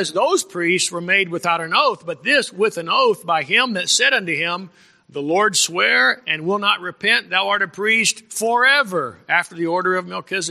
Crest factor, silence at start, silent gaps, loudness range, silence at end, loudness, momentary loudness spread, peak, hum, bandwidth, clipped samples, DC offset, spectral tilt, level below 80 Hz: 18 dB; 0 s; none; 1 LU; 0 s; -17 LUFS; 8 LU; -2 dBFS; none; 15 kHz; under 0.1%; under 0.1%; -2 dB/octave; -72 dBFS